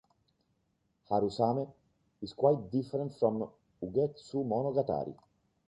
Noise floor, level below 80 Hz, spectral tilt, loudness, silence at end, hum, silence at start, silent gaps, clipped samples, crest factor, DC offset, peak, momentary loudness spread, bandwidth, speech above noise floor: -77 dBFS; -66 dBFS; -9 dB/octave; -32 LUFS; 0.55 s; none; 1.1 s; none; under 0.1%; 20 dB; under 0.1%; -14 dBFS; 14 LU; 9.2 kHz; 45 dB